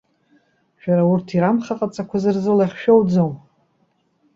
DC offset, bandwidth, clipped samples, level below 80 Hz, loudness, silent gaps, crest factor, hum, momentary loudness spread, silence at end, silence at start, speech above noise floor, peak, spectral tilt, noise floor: under 0.1%; 7.6 kHz; under 0.1%; -60 dBFS; -18 LUFS; none; 18 dB; none; 10 LU; 1 s; 0.85 s; 47 dB; -2 dBFS; -8.5 dB/octave; -64 dBFS